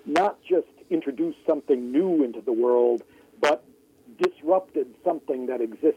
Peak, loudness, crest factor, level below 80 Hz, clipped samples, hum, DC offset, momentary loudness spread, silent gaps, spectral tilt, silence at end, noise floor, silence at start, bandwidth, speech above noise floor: -10 dBFS; -25 LUFS; 16 dB; -74 dBFS; under 0.1%; none; under 0.1%; 7 LU; none; -5.5 dB/octave; 0 s; -55 dBFS; 0.05 s; 10.5 kHz; 31 dB